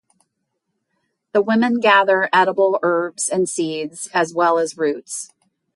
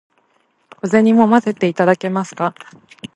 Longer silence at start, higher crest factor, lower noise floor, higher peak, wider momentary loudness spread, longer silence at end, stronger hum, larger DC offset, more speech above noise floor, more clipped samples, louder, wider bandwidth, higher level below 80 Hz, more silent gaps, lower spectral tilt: first, 1.35 s vs 0.85 s; about the same, 18 dB vs 16 dB; first, -75 dBFS vs -61 dBFS; about the same, -2 dBFS vs 0 dBFS; about the same, 12 LU vs 11 LU; first, 0.5 s vs 0.1 s; neither; neither; first, 57 dB vs 46 dB; neither; second, -18 LUFS vs -15 LUFS; first, 11.5 kHz vs 8.6 kHz; second, -72 dBFS vs -64 dBFS; neither; second, -3.5 dB/octave vs -7 dB/octave